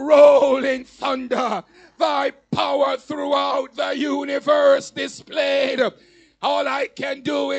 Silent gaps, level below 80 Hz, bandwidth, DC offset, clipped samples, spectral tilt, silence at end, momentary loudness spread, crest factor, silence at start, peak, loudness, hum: none; -64 dBFS; 8.6 kHz; under 0.1%; under 0.1%; -4 dB/octave; 0 s; 10 LU; 18 dB; 0 s; -2 dBFS; -20 LUFS; none